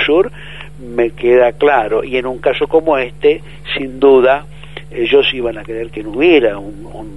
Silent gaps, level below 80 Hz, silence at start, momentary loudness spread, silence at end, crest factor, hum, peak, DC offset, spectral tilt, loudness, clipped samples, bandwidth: none; -38 dBFS; 0 s; 18 LU; 0 s; 14 dB; none; 0 dBFS; 2%; -6.5 dB/octave; -14 LUFS; under 0.1%; 11 kHz